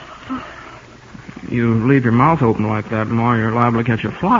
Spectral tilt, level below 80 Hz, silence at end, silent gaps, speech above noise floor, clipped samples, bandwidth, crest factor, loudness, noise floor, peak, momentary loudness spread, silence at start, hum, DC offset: -8.5 dB/octave; -44 dBFS; 0 s; none; 24 dB; under 0.1%; 7.4 kHz; 16 dB; -16 LUFS; -39 dBFS; 0 dBFS; 21 LU; 0 s; none; under 0.1%